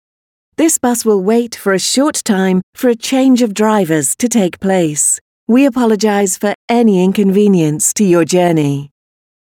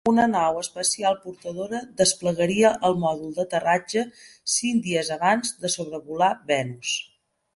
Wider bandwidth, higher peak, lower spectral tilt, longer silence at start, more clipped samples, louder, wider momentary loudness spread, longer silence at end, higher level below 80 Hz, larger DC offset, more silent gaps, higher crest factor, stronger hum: first, 18.5 kHz vs 11.5 kHz; first, 0 dBFS vs -4 dBFS; about the same, -4.5 dB/octave vs -3.5 dB/octave; first, 0.6 s vs 0.05 s; neither; first, -12 LUFS vs -24 LUFS; second, 5 LU vs 11 LU; about the same, 0.55 s vs 0.55 s; about the same, -58 dBFS vs -62 dBFS; neither; first, 2.63-2.73 s, 5.21-5.47 s, 6.55-6.68 s vs none; second, 12 dB vs 18 dB; neither